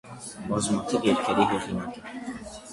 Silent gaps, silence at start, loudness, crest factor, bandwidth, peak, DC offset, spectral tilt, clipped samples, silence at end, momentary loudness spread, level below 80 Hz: none; 0.05 s; -26 LUFS; 20 dB; 11.5 kHz; -8 dBFS; under 0.1%; -4.5 dB/octave; under 0.1%; 0 s; 14 LU; -54 dBFS